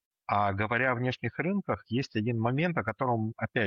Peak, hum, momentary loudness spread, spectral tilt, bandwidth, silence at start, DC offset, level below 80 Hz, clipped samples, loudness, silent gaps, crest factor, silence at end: -14 dBFS; none; 5 LU; -7.5 dB/octave; 7 kHz; 0.3 s; under 0.1%; -64 dBFS; under 0.1%; -30 LUFS; none; 16 dB; 0 s